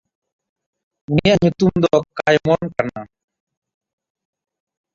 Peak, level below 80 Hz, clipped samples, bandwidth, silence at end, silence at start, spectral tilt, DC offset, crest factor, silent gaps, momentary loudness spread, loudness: -2 dBFS; -46 dBFS; under 0.1%; 7.6 kHz; 1.9 s; 1.1 s; -6.5 dB/octave; under 0.1%; 20 dB; none; 9 LU; -17 LUFS